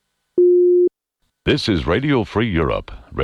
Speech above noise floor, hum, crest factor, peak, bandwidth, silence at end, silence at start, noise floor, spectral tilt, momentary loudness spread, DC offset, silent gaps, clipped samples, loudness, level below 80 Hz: 53 dB; none; 14 dB; -4 dBFS; 9.6 kHz; 0 s; 0.35 s; -71 dBFS; -7 dB/octave; 11 LU; under 0.1%; none; under 0.1%; -18 LUFS; -36 dBFS